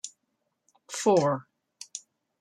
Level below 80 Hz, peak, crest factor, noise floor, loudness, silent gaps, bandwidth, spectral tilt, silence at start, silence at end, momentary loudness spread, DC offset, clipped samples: -78 dBFS; -10 dBFS; 20 dB; -79 dBFS; -26 LUFS; none; 14.5 kHz; -5 dB/octave; 0.05 s; 0.45 s; 20 LU; under 0.1%; under 0.1%